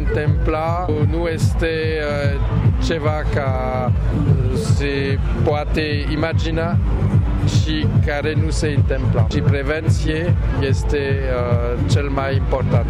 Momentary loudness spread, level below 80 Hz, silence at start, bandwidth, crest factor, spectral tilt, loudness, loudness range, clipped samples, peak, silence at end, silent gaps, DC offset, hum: 2 LU; -24 dBFS; 0 s; 11 kHz; 10 dB; -7 dB/octave; -19 LUFS; 1 LU; under 0.1%; -6 dBFS; 0 s; none; under 0.1%; none